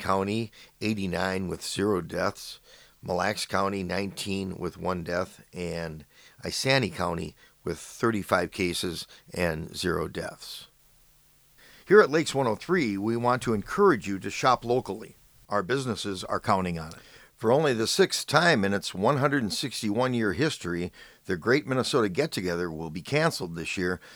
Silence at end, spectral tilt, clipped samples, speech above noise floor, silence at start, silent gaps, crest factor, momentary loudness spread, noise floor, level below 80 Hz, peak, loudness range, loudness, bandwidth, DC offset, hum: 0 s; -4.5 dB/octave; under 0.1%; 33 dB; 0 s; none; 24 dB; 14 LU; -60 dBFS; -56 dBFS; -4 dBFS; 6 LU; -27 LUFS; over 20 kHz; under 0.1%; none